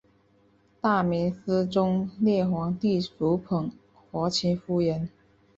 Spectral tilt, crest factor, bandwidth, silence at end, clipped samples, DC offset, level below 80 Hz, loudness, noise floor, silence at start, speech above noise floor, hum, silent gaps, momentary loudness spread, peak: -6.5 dB/octave; 16 dB; 7.8 kHz; 0.5 s; under 0.1%; under 0.1%; -58 dBFS; -27 LUFS; -63 dBFS; 0.85 s; 37 dB; none; none; 6 LU; -10 dBFS